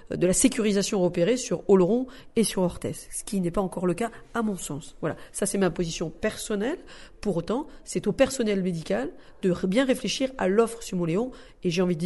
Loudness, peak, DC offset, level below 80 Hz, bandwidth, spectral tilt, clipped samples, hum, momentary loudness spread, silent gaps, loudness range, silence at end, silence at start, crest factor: -26 LUFS; -6 dBFS; under 0.1%; -48 dBFS; 12 kHz; -5 dB/octave; under 0.1%; none; 11 LU; none; 5 LU; 0 s; 0 s; 20 dB